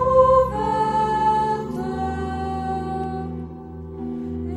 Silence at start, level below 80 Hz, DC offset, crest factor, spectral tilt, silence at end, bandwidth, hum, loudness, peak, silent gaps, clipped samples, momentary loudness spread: 0 s; -38 dBFS; under 0.1%; 18 dB; -7.5 dB/octave; 0 s; 11.5 kHz; none; -22 LUFS; -4 dBFS; none; under 0.1%; 16 LU